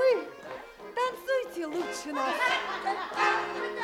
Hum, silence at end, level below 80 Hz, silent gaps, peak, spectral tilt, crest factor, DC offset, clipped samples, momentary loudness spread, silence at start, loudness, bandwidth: none; 0 s; -68 dBFS; none; -14 dBFS; -2.5 dB/octave; 16 dB; under 0.1%; under 0.1%; 13 LU; 0 s; -30 LUFS; 16.5 kHz